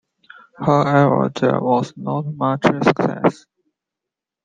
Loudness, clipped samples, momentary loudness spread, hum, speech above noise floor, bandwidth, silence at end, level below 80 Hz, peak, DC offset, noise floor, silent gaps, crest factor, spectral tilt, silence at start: -18 LUFS; under 0.1%; 10 LU; none; 68 dB; 9 kHz; 1.1 s; -58 dBFS; -2 dBFS; under 0.1%; -85 dBFS; none; 18 dB; -7.5 dB/octave; 0.6 s